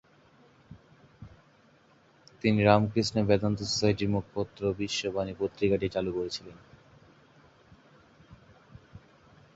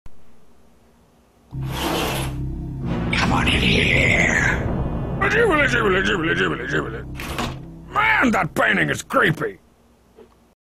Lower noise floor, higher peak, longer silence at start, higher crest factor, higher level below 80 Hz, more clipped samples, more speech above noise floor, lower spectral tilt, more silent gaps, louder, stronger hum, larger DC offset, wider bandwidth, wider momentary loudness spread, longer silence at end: first, -61 dBFS vs -55 dBFS; about the same, -6 dBFS vs -6 dBFS; first, 0.7 s vs 0.05 s; first, 26 dB vs 16 dB; second, -54 dBFS vs -34 dBFS; neither; about the same, 34 dB vs 36 dB; about the same, -5.5 dB/octave vs -5 dB/octave; neither; second, -28 LUFS vs -19 LUFS; neither; neither; second, 8 kHz vs 15.5 kHz; about the same, 11 LU vs 13 LU; first, 0.55 s vs 0.4 s